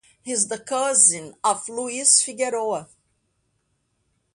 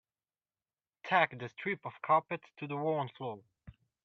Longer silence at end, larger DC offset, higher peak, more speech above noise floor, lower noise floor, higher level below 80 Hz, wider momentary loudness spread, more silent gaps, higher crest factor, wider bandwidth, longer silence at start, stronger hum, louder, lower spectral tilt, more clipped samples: first, 1.5 s vs 0.35 s; neither; first, -2 dBFS vs -12 dBFS; second, 49 dB vs over 56 dB; second, -71 dBFS vs under -90 dBFS; about the same, -72 dBFS vs -74 dBFS; about the same, 12 LU vs 14 LU; neither; about the same, 22 dB vs 24 dB; first, 11.5 kHz vs 6.8 kHz; second, 0.25 s vs 1.05 s; neither; first, -20 LUFS vs -34 LUFS; second, -0.5 dB/octave vs -7 dB/octave; neither